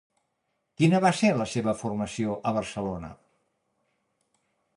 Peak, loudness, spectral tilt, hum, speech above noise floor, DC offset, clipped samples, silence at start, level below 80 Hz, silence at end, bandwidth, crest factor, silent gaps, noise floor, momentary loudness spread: -8 dBFS; -26 LUFS; -6 dB/octave; none; 52 dB; under 0.1%; under 0.1%; 0.8 s; -58 dBFS; 1.6 s; 11 kHz; 20 dB; none; -78 dBFS; 12 LU